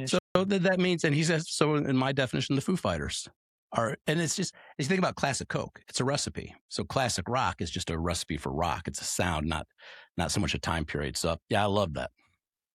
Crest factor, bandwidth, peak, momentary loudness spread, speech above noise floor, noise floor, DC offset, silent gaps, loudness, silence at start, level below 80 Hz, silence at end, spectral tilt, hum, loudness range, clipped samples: 22 dB; 14 kHz; -8 dBFS; 9 LU; 46 dB; -75 dBFS; under 0.1%; 0.20-0.35 s, 3.36-3.70 s, 6.61-6.69 s, 10.09-10.15 s; -30 LUFS; 0 s; -52 dBFS; 0.65 s; -4.5 dB/octave; none; 4 LU; under 0.1%